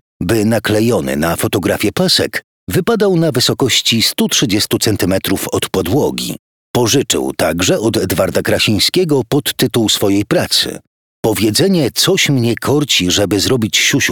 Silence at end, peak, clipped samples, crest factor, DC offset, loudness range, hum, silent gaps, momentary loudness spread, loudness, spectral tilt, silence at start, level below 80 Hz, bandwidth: 0 s; 0 dBFS; under 0.1%; 14 dB; 0.2%; 2 LU; none; 2.44-2.67 s, 6.39-6.74 s, 10.87-11.23 s; 6 LU; -13 LUFS; -4 dB/octave; 0.2 s; -42 dBFS; 19 kHz